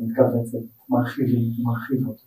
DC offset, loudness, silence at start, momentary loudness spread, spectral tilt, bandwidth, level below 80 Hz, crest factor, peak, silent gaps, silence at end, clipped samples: under 0.1%; -23 LUFS; 0 s; 7 LU; -9 dB/octave; 15.5 kHz; -62 dBFS; 18 dB; -4 dBFS; none; 0.1 s; under 0.1%